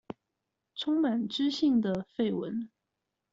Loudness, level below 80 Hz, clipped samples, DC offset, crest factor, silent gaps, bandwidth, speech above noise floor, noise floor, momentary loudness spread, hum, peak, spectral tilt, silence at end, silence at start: -30 LUFS; -70 dBFS; under 0.1%; under 0.1%; 14 dB; none; 7.8 kHz; 56 dB; -85 dBFS; 19 LU; none; -18 dBFS; -5 dB/octave; 0.65 s; 0.1 s